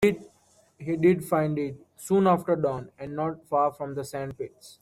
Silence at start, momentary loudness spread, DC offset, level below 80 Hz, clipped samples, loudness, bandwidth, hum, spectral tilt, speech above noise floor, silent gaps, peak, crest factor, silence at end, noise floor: 0 s; 16 LU; under 0.1%; -62 dBFS; under 0.1%; -27 LUFS; 16 kHz; none; -7 dB/octave; 36 dB; none; -10 dBFS; 18 dB; 0.1 s; -62 dBFS